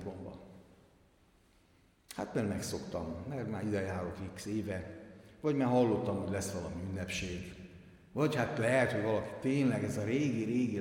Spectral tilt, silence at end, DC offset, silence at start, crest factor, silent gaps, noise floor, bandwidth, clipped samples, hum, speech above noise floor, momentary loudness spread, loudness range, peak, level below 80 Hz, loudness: -6 dB/octave; 0 s; under 0.1%; 0 s; 18 dB; none; -67 dBFS; 17 kHz; under 0.1%; none; 33 dB; 18 LU; 7 LU; -16 dBFS; -64 dBFS; -35 LUFS